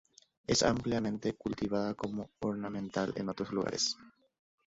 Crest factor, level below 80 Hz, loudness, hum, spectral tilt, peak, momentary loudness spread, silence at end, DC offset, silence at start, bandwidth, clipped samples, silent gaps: 20 dB; -60 dBFS; -34 LUFS; none; -4.5 dB/octave; -16 dBFS; 9 LU; 0.55 s; under 0.1%; 0.5 s; 7.6 kHz; under 0.1%; none